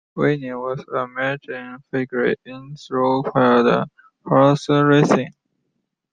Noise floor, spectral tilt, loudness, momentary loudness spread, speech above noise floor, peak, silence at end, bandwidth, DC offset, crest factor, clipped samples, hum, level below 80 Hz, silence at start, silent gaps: -74 dBFS; -7 dB/octave; -19 LUFS; 17 LU; 55 dB; -2 dBFS; 0.85 s; 9.2 kHz; under 0.1%; 18 dB; under 0.1%; none; -60 dBFS; 0.15 s; none